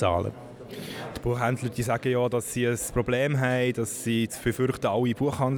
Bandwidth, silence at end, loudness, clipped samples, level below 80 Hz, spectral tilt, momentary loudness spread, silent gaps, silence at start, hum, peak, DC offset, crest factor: 19.5 kHz; 0 s; -27 LUFS; under 0.1%; -48 dBFS; -5.5 dB/octave; 11 LU; none; 0 s; none; -10 dBFS; under 0.1%; 16 dB